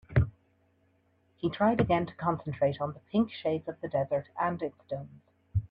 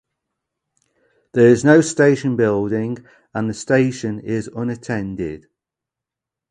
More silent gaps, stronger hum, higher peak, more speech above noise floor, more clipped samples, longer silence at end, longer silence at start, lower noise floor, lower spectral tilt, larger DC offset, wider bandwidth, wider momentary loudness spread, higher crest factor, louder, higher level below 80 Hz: neither; neither; second, -12 dBFS vs 0 dBFS; second, 39 dB vs 68 dB; neither; second, 0.05 s vs 1.1 s; second, 0.1 s vs 1.35 s; second, -69 dBFS vs -86 dBFS; first, -10.5 dB/octave vs -6.5 dB/octave; neither; second, 5.2 kHz vs 11 kHz; second, 10 LU vs 15 LU; about the same, 20 dB vs 18 dB; second, -31 LUFS vs -18 LUFS; about the same, -50 dBFS vs -52 dBFS